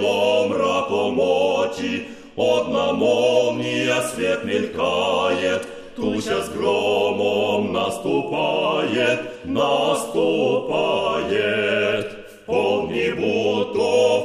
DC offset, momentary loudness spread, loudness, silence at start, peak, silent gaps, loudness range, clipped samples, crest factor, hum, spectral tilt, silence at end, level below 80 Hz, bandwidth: under 0.1%; 6 LU; -20 LUFS; 0 s; -6 dBFS; none; 1 LU; under 0.1%; 16 dB; none; -4.5 dB/octave; 0 s; -56 dBFS; 14.5 kHz